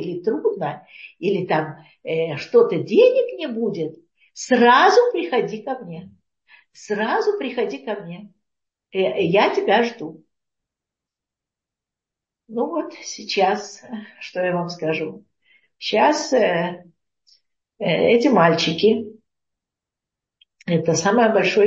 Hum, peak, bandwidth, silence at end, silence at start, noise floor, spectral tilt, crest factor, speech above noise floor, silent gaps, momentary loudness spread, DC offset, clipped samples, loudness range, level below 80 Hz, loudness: none; -2 dBFS; 8 kHz; 0 s; 0 s; -87 dBFS; -5 dB/octave; 18 dB; 68 dB; none; 18 LU; under 0.1%; under 0.1%; 9 LU; -70 dBFS; -20 LUFS